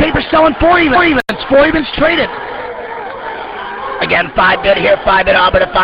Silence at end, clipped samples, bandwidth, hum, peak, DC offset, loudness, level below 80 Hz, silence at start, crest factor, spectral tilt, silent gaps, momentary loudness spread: 0 s; under 0.1%; 7.4 kHz; none; 0 dBFS; under 0.1%; -10 LUFS; -30 dBFS; 0 s; 12 dB; -6.5 dB/octave; none; 14 LU